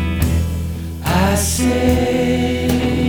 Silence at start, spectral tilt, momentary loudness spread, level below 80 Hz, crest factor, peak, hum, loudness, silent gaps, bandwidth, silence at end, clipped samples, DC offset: 0 s; -5.5 dB/octave; 8 LU; -26 dBFS; 16 dB; -2 dBFS; none; -17 LUFS; none; over 20 kHz; 0 s; under 0.1%; under 0.1%